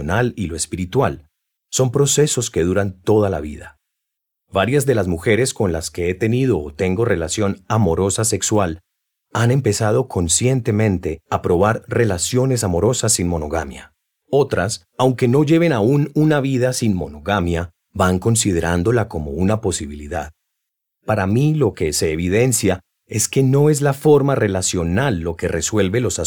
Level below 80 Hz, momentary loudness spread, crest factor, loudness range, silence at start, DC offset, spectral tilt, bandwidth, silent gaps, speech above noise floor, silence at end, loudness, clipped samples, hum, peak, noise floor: -40 dBFS; 9 LU; 16 dB; 3 LU; 0 s; under 0.1%; -5 dB/octave; over 20 kHz; none; 62 dB; 0 s; -18 LUFS; under 0.1%; none; -2 dBFS; -79 dBFS